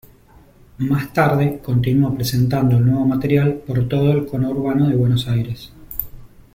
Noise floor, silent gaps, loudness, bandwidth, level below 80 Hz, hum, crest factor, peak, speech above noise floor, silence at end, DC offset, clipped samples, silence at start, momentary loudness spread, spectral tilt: -48 dBFS; none; -18 LUFS; 16.5 kHz; -42 dBFS; none; 16 dB; -2 dBFS; 31 dB; 0.3 s; under 0.1%; under 0.1%; 0.8 s; 12 LU; -7.5 dB/octave